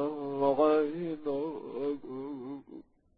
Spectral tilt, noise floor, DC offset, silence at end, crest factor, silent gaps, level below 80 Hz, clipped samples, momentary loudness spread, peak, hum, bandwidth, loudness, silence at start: -10.5 dB/octave; -52 dBFS; under 0.1%; 0.35 s; 18 dB; none; -68 dBFS; under 0.1%; 18 LU; -14 dBFS; none; 4.9 kHz; -32 LUFS; 0 s